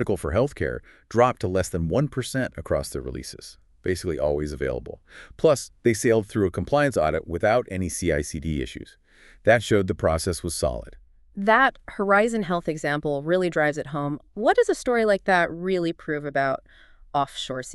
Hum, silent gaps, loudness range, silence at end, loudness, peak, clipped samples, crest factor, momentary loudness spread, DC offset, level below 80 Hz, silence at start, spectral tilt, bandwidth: none; none; 4 LU; 0 s; -24 LUFS; -4 dBFS; under 0.1%; 20 dB; 11 LU; under 0.1%; -42 dBFS; 0 s; -5.5 dB/octave; 12.5 kHz